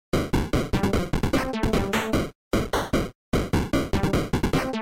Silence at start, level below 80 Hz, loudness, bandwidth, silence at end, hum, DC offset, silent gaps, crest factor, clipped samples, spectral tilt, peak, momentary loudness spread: 0.15 s; -32 dBFS; -25 LUFS; 16.5 kHz; 0 s; none; under 0.1%; 2.35-2.51 s, 3.15-3.32 s; 12 dB; under 0.1%; -6 dB/octave; -12 dBFS; 3 LU